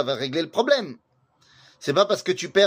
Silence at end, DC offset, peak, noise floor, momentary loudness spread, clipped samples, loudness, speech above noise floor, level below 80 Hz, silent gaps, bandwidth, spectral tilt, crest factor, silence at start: 0 s; under 0.1%; -4 dBFS; -60 dBFS; 7 LU; under 0.1%; -23 LUFS; 38 dB; -72 dBFS; none; 15.5 kHz; -4 dB/octave; 18 dB; 0 s